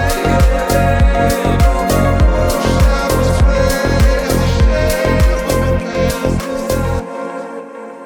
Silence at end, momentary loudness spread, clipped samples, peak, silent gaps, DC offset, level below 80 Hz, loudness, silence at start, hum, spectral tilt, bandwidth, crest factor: 0 s; 7 LU; under 0.1%; 0 dBFS; none; under 0.1%; -16 dBFS; -14 LUFS; 0 s; none; -6 dB/octave; 19.5 kHz; 12 dB